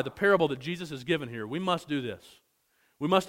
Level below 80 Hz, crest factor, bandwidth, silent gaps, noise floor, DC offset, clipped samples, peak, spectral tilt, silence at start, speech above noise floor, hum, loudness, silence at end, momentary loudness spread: -66 dBFS; 22 dB; 16 kHz; none; -71 dBFS; under 0.1%; under 0.1%; -8 dBFS; -5.5 dB/octave; 0 s; 42 dB; none; -30 LUFS; 0 s; 12 LU